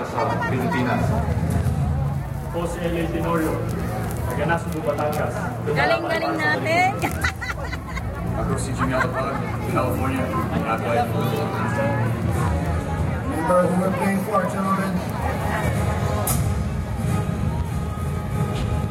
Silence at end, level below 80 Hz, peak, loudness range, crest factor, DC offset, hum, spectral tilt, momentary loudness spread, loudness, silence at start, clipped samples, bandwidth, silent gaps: 0 s; -34 dBFS; -6 dBFS; 2 LU; 16 dB; under 0.1%; none; -6.5 dB/octave; 6 LU; -23 LUFS; 0 s; under 0.1%; 16.5 kHz; none